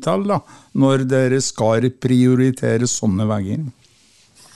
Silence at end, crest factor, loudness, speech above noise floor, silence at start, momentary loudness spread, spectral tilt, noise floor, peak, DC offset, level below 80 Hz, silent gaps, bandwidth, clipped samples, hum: 0.85 s; 14 dB; -18 LUFS; 37 dB; 0 s; 9 LU; -6 dB/octave; -54 dBFS; -4 dBFS; 0.4%; -56 dBFS; none; 12 kHz; under 0.1%; none